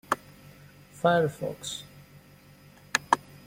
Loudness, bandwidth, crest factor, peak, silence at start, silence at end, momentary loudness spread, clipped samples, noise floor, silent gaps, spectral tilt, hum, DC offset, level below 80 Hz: -29 LUFS; 16.5 kHz; 28 dB; -2 dBFS; 0.1 s; 0.1 s; 16 LU; under 0.1%; -54 dBFS; none; -4 dB/octave; none; under 0.1%; -64 dBFS